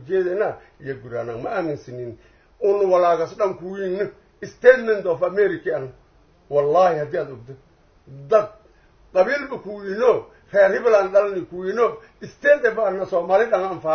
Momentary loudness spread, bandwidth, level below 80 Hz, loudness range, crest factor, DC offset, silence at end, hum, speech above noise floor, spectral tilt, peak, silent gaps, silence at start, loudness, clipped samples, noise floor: 17 LU; 6.6 kHz; -58 dBFS; 4 LU; 20 dB; under 0.1%; 0 s; none; 33 dB; -6.5 dB/octave; 0 dBFS; none; 0 s; -20 LUFS; under 0.1%; -53 dBFS